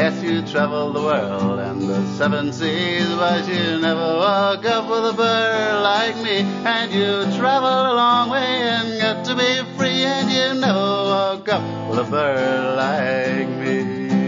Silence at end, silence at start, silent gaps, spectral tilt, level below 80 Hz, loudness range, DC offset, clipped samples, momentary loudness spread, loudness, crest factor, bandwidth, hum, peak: 0 s; 0 s; none; -5 dB/octave; -64 dBFS; 2 LU; under 0.1%; under 0.1%; 5 LU; -19 LUFS; 14 dB; 7.6 kHz; none; -4 dBFS